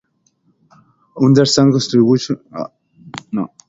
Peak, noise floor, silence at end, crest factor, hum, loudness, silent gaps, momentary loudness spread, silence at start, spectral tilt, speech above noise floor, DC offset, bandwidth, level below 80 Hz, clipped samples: 0 dBFS; -61 dBFS; 0.2 s; 16 dB; none; -14 LUFS; none; 19 LU; 1.15 s; -6 dB/octave; 47 dB; under 0.1%; 7.8 kHz; -56 dBFS; under 0.1%